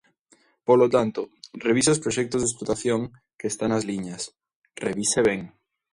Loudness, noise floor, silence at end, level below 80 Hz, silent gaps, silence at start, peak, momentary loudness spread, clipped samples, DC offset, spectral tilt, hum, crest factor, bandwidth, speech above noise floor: -24 LUFS; -62 dBFS; 0.45 s; -56 dBFS; 4.55-4.62 s; 0.7 s; -6 dBFS; 14 LU; under 0.1%; under 0.1%; -4 dB/octave; none; 18 dB; 11.5 kHz; 39 dB